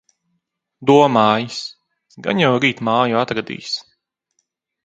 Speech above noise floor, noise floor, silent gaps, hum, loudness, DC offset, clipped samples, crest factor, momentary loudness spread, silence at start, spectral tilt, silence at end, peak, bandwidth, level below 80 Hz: 56 dB; -73 dBFS; none; none; -17 LUFS; under 0.1%; under 0.1%; 18 dB; 14 LU; 0.8 s; -5.5 dB/octave; 1.05 s; 0 dBFS; 9 kHz; -62 dBFS